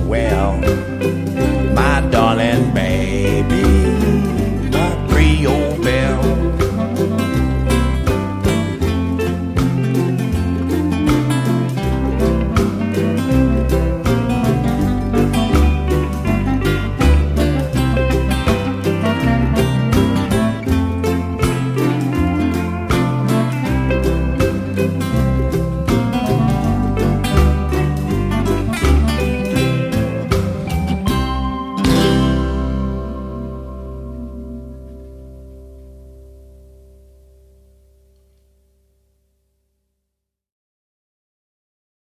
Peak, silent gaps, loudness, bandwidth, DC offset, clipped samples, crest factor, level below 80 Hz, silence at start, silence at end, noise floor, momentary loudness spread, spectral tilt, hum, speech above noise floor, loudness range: 0 dBFS; none; -17 LUFS; 16 kHz; under 0.1%; under 0.1%; 16 dB; -22 dBFS; 0 s; 5.7 s; -79 dBFS; 5 LU; -7 dB/octave; none; 63 dB; 3 LU